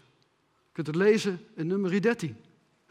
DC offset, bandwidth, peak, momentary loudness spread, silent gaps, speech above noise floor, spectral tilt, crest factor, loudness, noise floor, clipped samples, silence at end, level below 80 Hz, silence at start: under 0.1%; 12.5 kHz; -10 dBFS; 13 LU; none; 43 dB; -6 dB/octave; 18 dB; -28 LUFS; -70 dBFS; under 0.1%; 0.55 s; -76 dBFS; 0.75 s